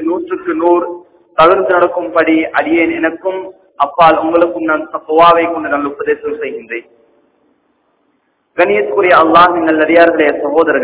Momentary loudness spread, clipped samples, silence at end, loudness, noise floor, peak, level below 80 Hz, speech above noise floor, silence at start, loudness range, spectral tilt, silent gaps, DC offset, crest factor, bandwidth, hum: 13 LU; 1%; 0 s; -11 LUFS; -60 dBFS; 0 dBFS; -50 dBFS; 49 dB; 0 s; 7 LU; -8.5 dB/octave; none; under 0.1%; 12 dB; 4 kHz; none